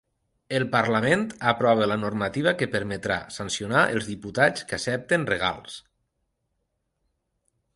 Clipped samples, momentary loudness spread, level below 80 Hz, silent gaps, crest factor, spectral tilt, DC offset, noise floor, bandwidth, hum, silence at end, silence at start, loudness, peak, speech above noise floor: under 0.1%; 8 LU; -56 dBFS; none; 20 dB; -4.5 dB/octave; under 0.1%; -77 dBFS; 11.5 kHz; none; 1.95 s; 0.5 s; -24 LUFS; -6 dBFS; 52 dB